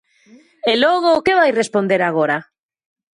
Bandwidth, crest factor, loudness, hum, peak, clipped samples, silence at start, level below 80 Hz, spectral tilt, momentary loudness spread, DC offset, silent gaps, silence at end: 11 kHz; 14 dB; -16 LUFS; none; -2 dBFS; under 0.1%; 0.65 s; -58 dBFS; -4.5 dB/octave; 6 LU; under 0.1%; none; 0.75 s